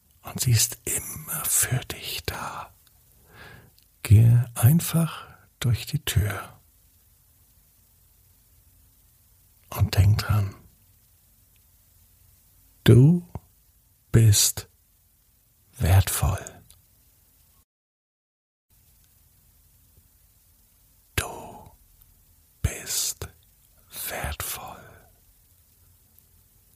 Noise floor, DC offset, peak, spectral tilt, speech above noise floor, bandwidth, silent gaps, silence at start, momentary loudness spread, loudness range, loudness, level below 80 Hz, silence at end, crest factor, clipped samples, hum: -62 dBFS; under 0.1%; -4 dBFS; -4.5 dB/octave; 41 dB; 15.5 kHz; 17.64-18.69 s; 0.25 s; 23 LU; 15 LU; -23 LUFS; -44 dBFS; 2 s; 22 dB; under 0.1%; none